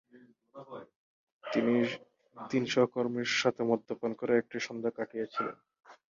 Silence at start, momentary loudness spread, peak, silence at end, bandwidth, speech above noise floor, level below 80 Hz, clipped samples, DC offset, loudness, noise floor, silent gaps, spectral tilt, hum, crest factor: 0.15 s; 19 LU; -14 dBFS; 0.2 s; 7.6 kHz; 29 dB; -78 dBFS; under 0.1%; under 0.1%; -32 LUFS; -61 dBFS; 0.96-1.40 s; -5 dB/octave; none; 20 dB